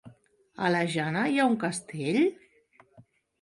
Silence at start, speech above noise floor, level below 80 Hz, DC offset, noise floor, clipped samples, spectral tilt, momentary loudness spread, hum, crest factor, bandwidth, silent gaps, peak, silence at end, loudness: 0.05 s; 35 dB; -72 dBFS; under 0.1%; -62 dBFS; under 0.1%; -5.5 dB/octave; 6 LU; none; 16 dB; 11.5 kHz; none; -12 dBFS; 0.4 s; -27 LUFS